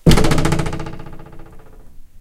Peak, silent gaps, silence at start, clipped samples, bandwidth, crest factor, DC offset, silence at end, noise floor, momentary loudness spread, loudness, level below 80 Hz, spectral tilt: 0 dBFS; none; 0.05 s; under 0.1%; 14.5 kHz; 16 dB; under 0.1%; 0 s; -36 dBFS; 25 LU; -18 LUFS; -22 dBFS; -5.5 dB/octave